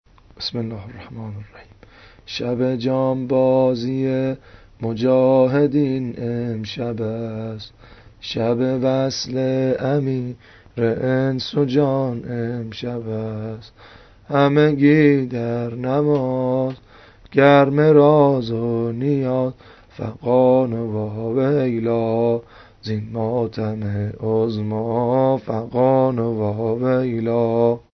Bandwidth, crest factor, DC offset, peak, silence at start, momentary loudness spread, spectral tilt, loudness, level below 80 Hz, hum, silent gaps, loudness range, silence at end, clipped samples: 6.4 kHz; 20 dB; under 0.1%; 0 dBFS; 0.4 s; 14 LU; -8 dB/octave; -19 LUFS; -52 dBFS; none; none; 6 LU; 0.15 s; under 0.1%